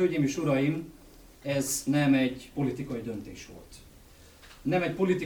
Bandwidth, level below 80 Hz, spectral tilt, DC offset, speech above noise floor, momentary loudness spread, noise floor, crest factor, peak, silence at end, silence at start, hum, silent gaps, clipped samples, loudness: over 20 kHz; -56 dBFS; -5.5 dB/octave; under 0.1%; 25 dB; 19 LU; -53 dBFS; 16 dB; -14 dBFS; 0 s; 0 s; none; none; under 0.1%; -29 LUFS